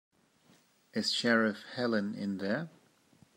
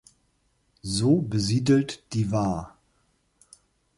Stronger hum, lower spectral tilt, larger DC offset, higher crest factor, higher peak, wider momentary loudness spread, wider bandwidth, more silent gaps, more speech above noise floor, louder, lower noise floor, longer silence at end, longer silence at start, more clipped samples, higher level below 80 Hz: neither; second, -4.5 dB/octave vs -6 dB/octave; neither; about the same, 20 dB vs 18 dB; second, -14 dBFS vs -8 dBFS; second, 9 LU vs 12 LU; first, 13 kHz vs 11.5 kHz; neither; second, 34 dB vs 45 dB; second, -32 LUFS vs -25 LUFS; about the same, -66 dBFS vs -69 dBFS; second, 0.7 s vs 1.3 s; about the same, 0.95 s vs 0.85 s; neither; second, -84 dBFS vs -52 dBFS